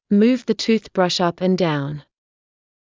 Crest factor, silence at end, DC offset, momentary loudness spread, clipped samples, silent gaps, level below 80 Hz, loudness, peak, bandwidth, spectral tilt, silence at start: 16 dB; 0.95 s; under 0.1%; 9 LU; under 0.1%; none; -60 dBFS; -19 LUFS; -4 dBFS; 7.6 kHz; -6 dB/octave; 0.1 s